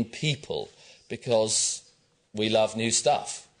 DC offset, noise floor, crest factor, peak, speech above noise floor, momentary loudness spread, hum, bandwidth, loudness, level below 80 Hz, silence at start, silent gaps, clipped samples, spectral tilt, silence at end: under 0.1%; -63 dBFS; 18 dB; -10 dBFS; 36 dB; 14 LU; none; 10 kHz; -26 LUFS; -66 dBFS; 0 s; none; under 0.1%; -3 dB/octave; 0.2 s